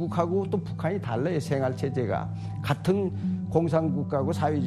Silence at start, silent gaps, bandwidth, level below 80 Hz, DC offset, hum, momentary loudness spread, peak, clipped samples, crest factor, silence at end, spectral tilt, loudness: 0 s; none; 13 kHz; -54 dBFS; under 0.1%; none; 5 LU; -8 dBFS; under 0.1%; 18 dB; 0 s; -8 dB/octave; -28 LUFS